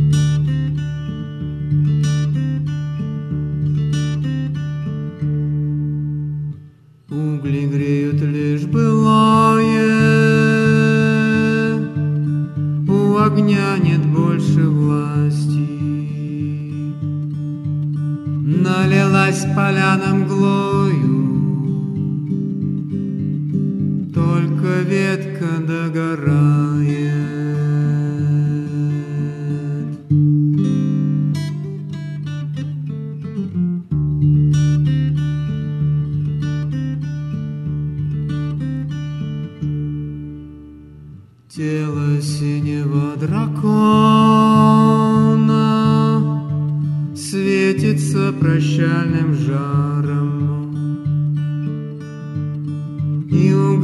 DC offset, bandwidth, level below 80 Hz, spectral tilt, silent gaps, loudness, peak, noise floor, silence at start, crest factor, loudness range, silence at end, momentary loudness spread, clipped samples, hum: under 0.1%; 11 kHz; -44 dBFS; -7.5 dB/octave; none; -18 LUFS; 0 dBFS; -43 dBFS; 0 s; 16 dB; 9 LU; 0 s; 11 LU; under 0.1%; none